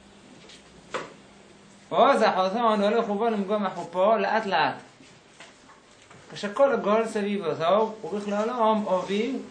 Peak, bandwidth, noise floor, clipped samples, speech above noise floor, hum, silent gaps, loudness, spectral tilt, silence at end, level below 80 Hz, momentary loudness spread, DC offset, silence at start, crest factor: -6 dBFS; 10 kHz; -53 dBFS; under 0.1%; 29 dB; none; none; -24 LUFS; -5.5 dB/octave; 0 s; -70 dBFS; 14 LU; under 0.1%; 0.3 s; 18 dB